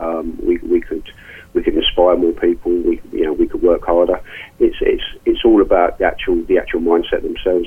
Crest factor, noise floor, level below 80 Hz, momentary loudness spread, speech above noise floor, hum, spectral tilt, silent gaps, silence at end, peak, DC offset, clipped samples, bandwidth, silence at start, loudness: 14 dB; -38 dBFS; -32 dBFS; 8 LU; 23 dB; none; -6.5 dB/octave; none; 0 s; -2 dBFS; under 0.1%; under 0.1%; 3.6 kHz; 0 s; -16 LUFS